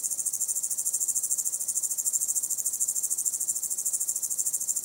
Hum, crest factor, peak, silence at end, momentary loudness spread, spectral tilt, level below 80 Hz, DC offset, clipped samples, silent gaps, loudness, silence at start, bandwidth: none; 20 dB; -10 dBFS; 0 s; 2 LU; 2 dB/octave; -80 dBFS; under 0.1%; under 0.1%; none; -26 LUFS; 0 s; 17 kHz